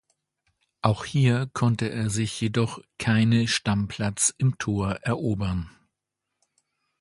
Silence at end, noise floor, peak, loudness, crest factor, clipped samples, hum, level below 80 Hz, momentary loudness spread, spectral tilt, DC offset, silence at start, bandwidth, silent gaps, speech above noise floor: 1.3 s; -83 dBFS; -2 dBFS; -25 LUFS; 22 dB; under 0.1%; none; -48 dBFS; 7 LU; -5 dB/octave; under 0.1%; 0.85 s; 11.5 kHz; none; 59 dB